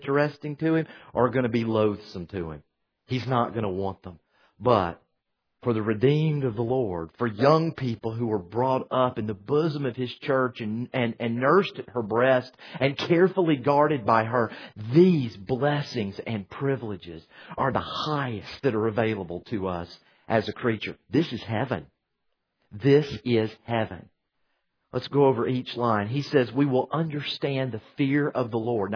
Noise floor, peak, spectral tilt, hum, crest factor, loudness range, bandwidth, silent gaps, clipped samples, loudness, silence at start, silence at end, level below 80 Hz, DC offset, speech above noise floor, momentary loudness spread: -78 dBFS; -4 dBFS; -8 dB/octave; none; 20 dB; 6 LU; 5.4 kHz; none; under 0.1%; -26 LUFS; 0 s; 0 s; -60 dBFS; under 0.1%; 53 dB; 11 LU